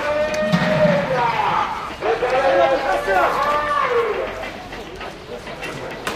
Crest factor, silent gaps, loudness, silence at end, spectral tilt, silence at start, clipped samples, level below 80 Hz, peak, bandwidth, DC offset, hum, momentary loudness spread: 16 dB; none; -19 LUFS; 0 s; -5.5 dB/octave; 0 s; under 0.1%; -44 dBFS; -4 dBFS; 15.5 kHz; under 0.1%; none; 15 LU